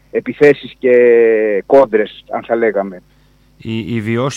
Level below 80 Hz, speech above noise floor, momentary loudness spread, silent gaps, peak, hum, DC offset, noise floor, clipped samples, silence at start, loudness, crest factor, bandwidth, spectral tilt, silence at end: -52 dBFS; 35 dB; 15 LU; none; 0 dBFS; none; under 0.1%; -48 dBFS; under 0.1%; 0.15 s; -13 LUFS; 14 dB; 7.8 kHz; -6.5 dB/octave; 0 s